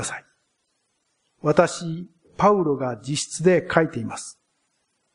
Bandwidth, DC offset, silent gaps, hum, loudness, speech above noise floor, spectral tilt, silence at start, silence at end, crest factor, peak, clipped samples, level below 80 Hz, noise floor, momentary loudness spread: 10.5 kHz; under 0.1%; none; none; -22 LUFS; 51 dB; -5 dB/octave; 0 s; 0.85 s; 24 dB; 0 dBFS; under 0.1%; -60 dBFS; -72 dBFS; 16 LU